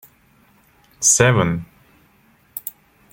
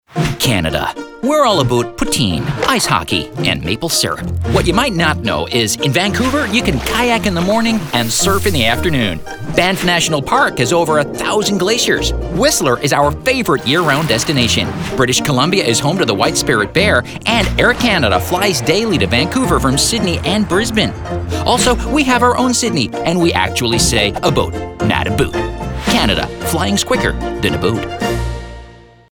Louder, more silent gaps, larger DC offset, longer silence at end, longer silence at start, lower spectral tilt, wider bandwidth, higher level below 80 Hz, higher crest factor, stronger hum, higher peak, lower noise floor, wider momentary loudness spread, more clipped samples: about the same, -16 LUFS vs -14 LUFS; neither; neither; about the same, 0.4 s vs 0.35 s; first, 1 s vs 0.1 s; about the same, -3.5 dB/octave vs -4 dB/octave; second, 17 kHz vs over 20 kHz; second, -52 dBFS vs -30 dBFS; first, 22 dB vs 14 dB; neither; about the same, 0 dBFS vs 0 dBFS; first, -56 dBFS vs -38 dBFS; first, 20 LU vs 6 LU; neither